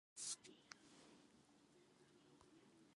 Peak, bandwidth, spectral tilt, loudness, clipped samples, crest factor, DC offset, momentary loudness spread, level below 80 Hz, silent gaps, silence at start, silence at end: -34 dBFS; 11.5 kHz; -0.5 dB/octave; -53 LUFS; under 0.1%; 26 dB; under 0.1%; 20 LU; under -90 dBFS; none; 0.15 s; 0 s